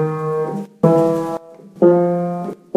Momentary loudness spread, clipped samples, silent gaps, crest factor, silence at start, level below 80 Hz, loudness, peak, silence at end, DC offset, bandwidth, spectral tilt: 12 LU; under 0.1%; none; 18 dB; 0 s; -66 dBFS; -17 LUFS; 0 dBFS; 0.2 s; under 0.1%; 12.5 kHz; -9.5 dB/octave